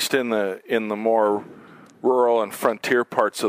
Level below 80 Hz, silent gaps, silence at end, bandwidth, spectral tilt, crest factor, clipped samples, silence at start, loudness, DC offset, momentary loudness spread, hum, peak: -76 dBFS; none; 0 s; 16 kHz; -3.5 dB/octave; 18 dB; under 0.1%; 0 s; -22 LUFS; under 0.1%; 6 LU; none; -4 dBFS